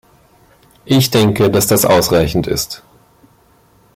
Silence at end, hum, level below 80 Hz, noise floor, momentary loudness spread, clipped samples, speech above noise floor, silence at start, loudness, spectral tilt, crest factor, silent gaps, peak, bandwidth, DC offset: 1.2 s; none; -38 dBFS; -51 dBFS; 9 LU; under 0.1%; 38 dB; 0.85 s; -13 LUFS; -4.5 dB/octave; 14 dB; none; -2 dBFS; 16.5 kHz; under 0.1%